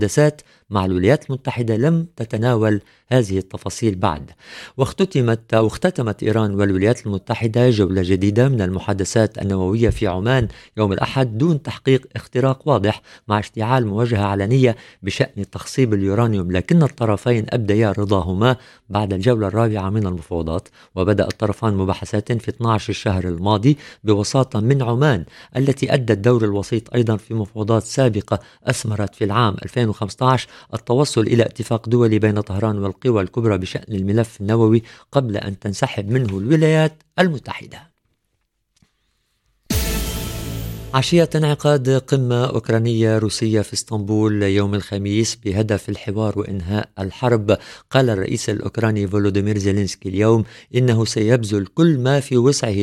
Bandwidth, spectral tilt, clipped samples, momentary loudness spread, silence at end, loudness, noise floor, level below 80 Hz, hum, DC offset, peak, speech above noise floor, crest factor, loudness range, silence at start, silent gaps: 17 kHz; -6.5 dB/octave; under 0.1%; 8 LU; 0 s; -19 LUFS; -70 dBFS; -42 dBFS; none; under 0.1%; 0 dBFS; 52 dB; 18 dB; 3 LU; 0 s; none